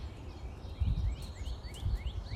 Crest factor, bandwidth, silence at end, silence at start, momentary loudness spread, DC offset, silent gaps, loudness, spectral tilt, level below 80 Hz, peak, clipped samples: 16 dB; 12.5 kHz; 0 s; 0 s; 11 LU; under 0.1%; none; -39 LUFS; -6.5 dB/octave; -38 dBFS; -22 dBFS; under 0.1%